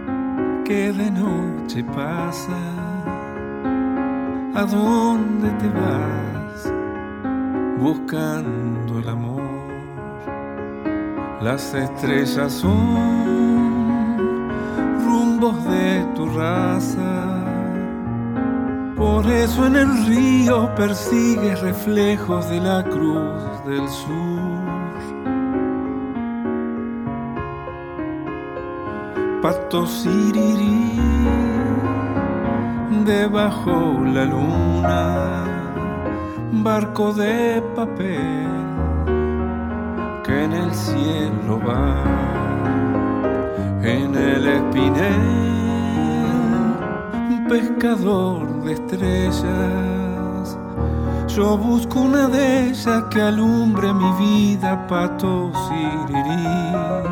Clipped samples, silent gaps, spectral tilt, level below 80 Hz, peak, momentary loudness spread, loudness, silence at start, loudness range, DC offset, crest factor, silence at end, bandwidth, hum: under 0.1%; none; -7 dB/octave; -34 dBFS; -4 dBFS; 9 LU; -20 LUFS; 0 s; 7 LU; under 0.1%; 16 dB; 0 s; 19 kHz; none